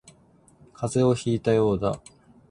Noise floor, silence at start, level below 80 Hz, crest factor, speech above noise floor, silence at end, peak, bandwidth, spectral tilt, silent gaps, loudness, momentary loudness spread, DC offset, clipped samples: -57 dBFS; 0.8 s; -52 dBFS; 16 dB; 34 dB; 0.5 s; -8 dBFS; 11.5 kHz; -7 dB/octave; none; -24 LUFS; 10 LU; under 0.1%; under 0.1%